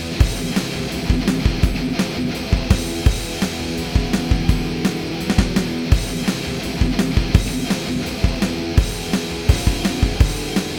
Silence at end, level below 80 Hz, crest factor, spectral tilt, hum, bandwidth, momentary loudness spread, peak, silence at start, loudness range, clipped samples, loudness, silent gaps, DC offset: 0 s; -24 dBFS; 18 dB; -5.5 dB/octave; none; over 20 kHz; 4 LU; 0 dBFS; 0 s; 1 LU; under 0.1%; -20 LUFS; none; under 0.1%